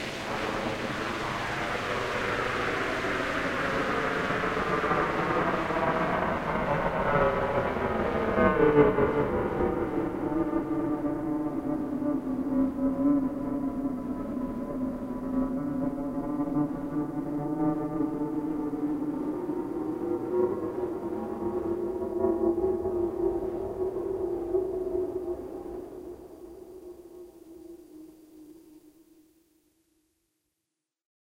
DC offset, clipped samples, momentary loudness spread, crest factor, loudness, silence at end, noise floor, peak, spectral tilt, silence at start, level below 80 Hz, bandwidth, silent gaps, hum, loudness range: under 0.1%; under 0.1%; 9 LU; 22 dB; -29 LUFS; 2.5 s; -86 dBFS; -8 dBFS; -6.5 dB/octave; 0 s; -48 dBFS; 16 kHz; none; none; 8 LU